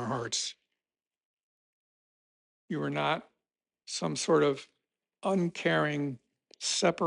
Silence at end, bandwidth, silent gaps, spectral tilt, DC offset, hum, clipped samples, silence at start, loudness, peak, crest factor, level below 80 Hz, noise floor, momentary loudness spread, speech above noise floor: 0 s; 11 kHz; 1.25-1.37 s, 1.43-2.68 s; -4 dB/octave; under 0.1%; none; under 0.1%; 0 s; -31 LUFS; -14 dBFS; 20 dB; -74 dBFS; under -90 dBFS; 11 LU; over 60 dB